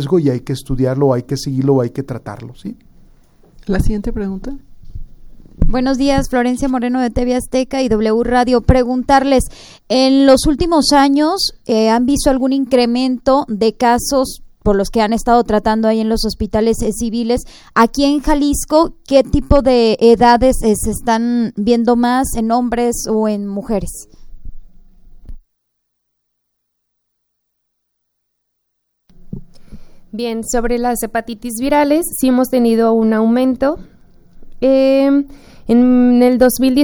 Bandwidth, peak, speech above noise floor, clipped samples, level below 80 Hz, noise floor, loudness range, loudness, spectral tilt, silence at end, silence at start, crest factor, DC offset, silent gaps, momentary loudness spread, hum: over 20 kHz; 0 dBFS; 57 dB; under 0.1%; -28 dBFS; -71 dBFS; 10 LU; -14 LUFS; -5.5 dB/octave; 0 s; 0 s; 14 dB; under 0.1%; none; 11 LU; 60 Hz at -40 dBFS